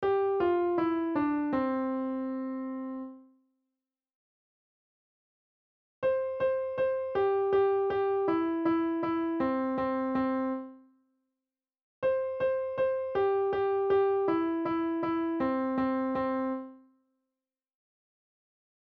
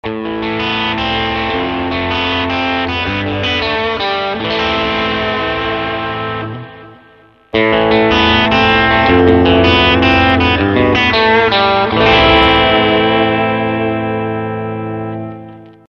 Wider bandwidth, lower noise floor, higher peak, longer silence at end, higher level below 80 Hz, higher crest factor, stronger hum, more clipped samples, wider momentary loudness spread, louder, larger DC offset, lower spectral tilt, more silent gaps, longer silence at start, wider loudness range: second, 5.2 kHz vs 7 kHz; first, under -90 dBFS vs -45 dBFS; second, -18 dBFS vs 0 dBFS; first, 2.2 s vs 0.2 s; second, -64 dBFS vs -32 dBFS; about the same, 14 dB vs 14 dB; neither; neither; second, 8 LU vs 11 LU; second, -30 LUFS vs -12 LUFS; neither; first, -9 dB/octave vs -6.5 dB/octave; first, 4.15-6.02 s, 11.82-12.02 s vs none; about the same, 0 s vs 0.05 s; about the same, 9 LU vs 7 LU